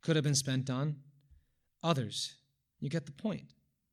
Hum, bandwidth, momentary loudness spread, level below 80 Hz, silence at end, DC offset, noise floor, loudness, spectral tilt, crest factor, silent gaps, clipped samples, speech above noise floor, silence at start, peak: none; 14.5 kHz; 12 LU; -72 dBFS; 0.45 s; under 0.1%; -68 dBFS; -35 LUFS; -4.5 dB/octave; 22 dB; none; under 0.1%; 34 dB; 0.05 s; -14 dBFS